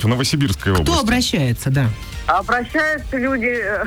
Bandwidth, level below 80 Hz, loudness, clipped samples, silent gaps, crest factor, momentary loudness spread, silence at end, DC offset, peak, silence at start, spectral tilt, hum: over 20 kHz; -32 dBFS; -18 LUFS; under 0.1%; none; 12 dB; 4 LU; 0 s; under 0.1%; -6 dBFS; 0 s; -5 dB/octave; none